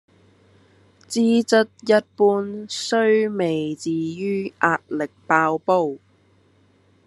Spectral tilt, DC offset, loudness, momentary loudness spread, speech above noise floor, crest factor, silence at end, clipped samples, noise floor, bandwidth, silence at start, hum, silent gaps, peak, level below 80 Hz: -5 dB/octave; under 0.1%; -21 LUFS; 10 LU; 38 dB; 20 dB; 1.1 s; under 0.1%; -58 dBFS; 12 kHz; 1.1 s; 50 Hz at -50 dBFS; none; -2 dBFS; -74 dBFS